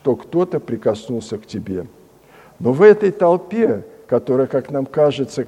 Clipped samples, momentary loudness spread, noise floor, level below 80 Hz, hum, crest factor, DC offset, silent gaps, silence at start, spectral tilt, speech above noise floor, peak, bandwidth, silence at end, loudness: under 0.1%; 15 LU; -47 dBFS; -58 dBFS; none; 18 dB; under 0.1%; none; 0.05 s; -7 dB/octave; 30 dB; 0 dBFS; 9.6 kHz; 0 s; -18 LUFS